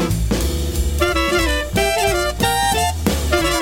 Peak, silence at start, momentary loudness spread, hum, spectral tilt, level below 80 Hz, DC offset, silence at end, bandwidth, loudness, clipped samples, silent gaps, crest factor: -2 dBFS; 0 s; 4 LU; none; -4 dB/octave; -24 dBFS; under 0.1%; 0 s; 17 kHz; -18 LUFS; under 0.1%; none; 16 dB